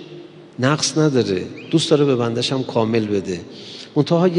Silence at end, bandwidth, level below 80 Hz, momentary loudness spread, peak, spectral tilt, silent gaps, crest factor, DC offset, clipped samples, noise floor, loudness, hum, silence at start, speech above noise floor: 0 s; 11 kHz; -64 dBFS; 18 LU; -2 dBFS; -5.5 dB/octave; none; 18 dB; under 0.1%; under 0.1%; -39 dBFS; -19 LUFS; none; 0 s; 21 dB